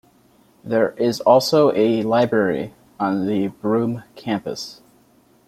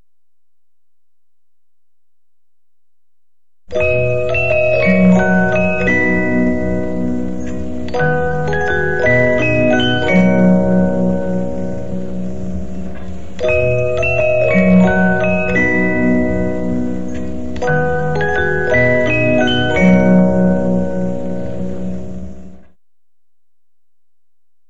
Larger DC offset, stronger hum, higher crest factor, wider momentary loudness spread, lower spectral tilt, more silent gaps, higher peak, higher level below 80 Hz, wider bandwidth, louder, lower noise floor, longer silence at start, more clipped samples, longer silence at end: second, under 0.1% vs 9%; neither; about the same, 18 dB vs 14 dB; about the same, 14 LU vs 13 LU; second, -6 dB/octave vs -7.5 dB/octave; neither; about the same, -2 dBFS vs -2 dBFS; second, -60 dBFS vs -34 dBFS; first, 16 kHz vs 7.8 kHz; second, -19 LUFS vs -15 LUFS; second, -56 dBFS vs -83 dBFS; first, 0.65 s vs 0 s; neither; first, 0.75 s vs 0 s